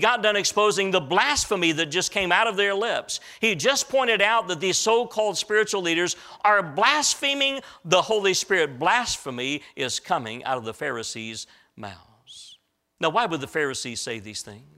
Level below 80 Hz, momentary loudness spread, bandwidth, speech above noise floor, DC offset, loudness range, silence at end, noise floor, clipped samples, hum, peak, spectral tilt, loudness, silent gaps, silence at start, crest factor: -58 dBFS; 12 LU; 16 kHz; 33 dB; under 0.1%; 8 LU; 0.2 s; -57 dBFS; under 0.1%; none; -4 dBFS; -2 dB/octave; -23 LUFS; none; 0 s; 20 dB